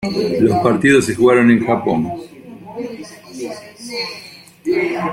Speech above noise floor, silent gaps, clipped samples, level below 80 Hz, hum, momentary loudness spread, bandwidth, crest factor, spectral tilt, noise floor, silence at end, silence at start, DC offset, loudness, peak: 25 dB; none; under 0.1%; -52 dBFS; none; 21 LU; 15.5 kHz; 16 dB; -5.5 dB/octave; -39 dBFS; 0 s; 0 s; under 0.1%; -15 LUFS; -2 dBFS